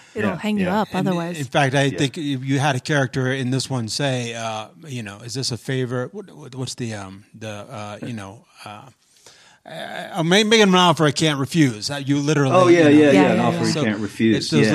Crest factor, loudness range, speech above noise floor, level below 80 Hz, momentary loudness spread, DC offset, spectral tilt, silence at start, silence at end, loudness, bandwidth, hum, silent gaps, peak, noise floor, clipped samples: 18 dB; 17 LU; 30 dB; -62 dBFS; 20 LU; under 0.1%; -5 dB/octave; 0.15 s; 0 s; -19 LUFS; 13.5 kHz; none; none; -2 dBFS; -50 dBFS; under 0.1%